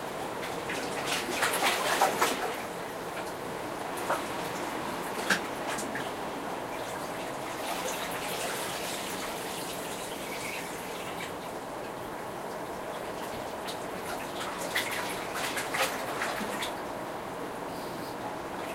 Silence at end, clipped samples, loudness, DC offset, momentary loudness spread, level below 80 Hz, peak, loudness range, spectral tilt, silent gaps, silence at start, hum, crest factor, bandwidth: 0 s; under 0.1%; -33 LUFS; under 0.1%; 9 LU; -62 dBFS; -10 dBFS; 7 LU; -2.5 dB/octave; none; 0 s; none; 24 dB; 16 kHz